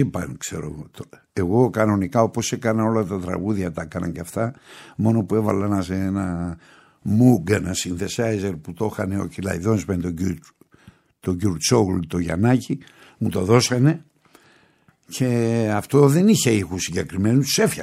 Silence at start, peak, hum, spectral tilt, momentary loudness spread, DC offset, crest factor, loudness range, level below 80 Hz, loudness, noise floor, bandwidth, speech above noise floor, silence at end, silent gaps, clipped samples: 0 s; -2 dBFS; none; -5.5 dB/octave; 13 LU; under 0.1%; 20 dB; 4 LU; -50 dBFS; -21 LUFS; -58 dBFS; 16 kHz; 38 dB; 0 s; none; under 0.1%